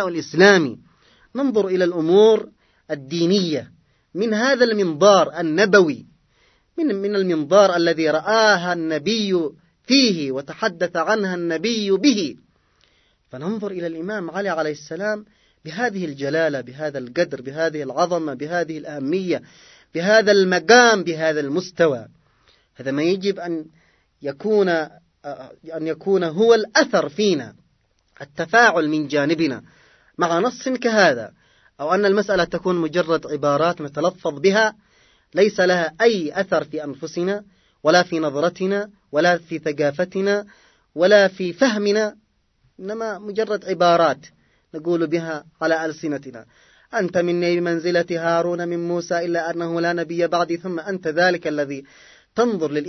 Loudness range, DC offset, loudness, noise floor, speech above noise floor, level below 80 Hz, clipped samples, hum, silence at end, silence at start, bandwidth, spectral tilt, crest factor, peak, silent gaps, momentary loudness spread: 6 LU; under 0.1%; -20 LUFS; -64 dBFS; 45 dB; -64 dBFS; under 0.1%; none; 0 s; 0 s; 6.4 kHz; -4.5 dB/octave; 20 dB; 0 dBFS; none; 14 LU